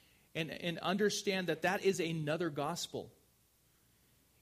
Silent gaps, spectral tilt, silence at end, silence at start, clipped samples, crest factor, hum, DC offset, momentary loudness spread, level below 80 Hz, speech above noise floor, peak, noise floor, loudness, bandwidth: none; -4.5 dB/octave; 1.3 s; 0.35 s; under 0.1%; 18 dB; none; under 0.1%; 10 LU; -74 dBFS; 35 dB; -20 dBFS; -71 dBFS; -36 LUFS; 15.5 kHz